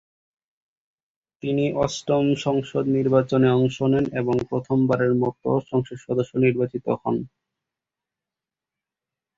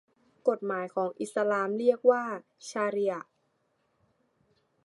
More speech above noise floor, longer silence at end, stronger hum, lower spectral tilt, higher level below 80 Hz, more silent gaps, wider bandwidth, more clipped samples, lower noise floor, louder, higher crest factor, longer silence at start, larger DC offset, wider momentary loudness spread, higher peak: first, 67 dB vs 46 dB; first, 2.1 s vs 1.6 s; neither; first, -7 dB/octave vs -5.5 dB/octave; first, -56 dBFS vs -86 dBFS; neither; second, 7.8 kHz vs 11.5 kHz; neither; first, -89 dBFS vs -74 dBFS; first, -22 LUFS vs -29 LUFS; about the same, 20 dB vs 22 dB; first, 1.45 s vs 0.45 s; neither; second, 7 LU vs 13 LU; first, -4 dBFS vs -10 dBFS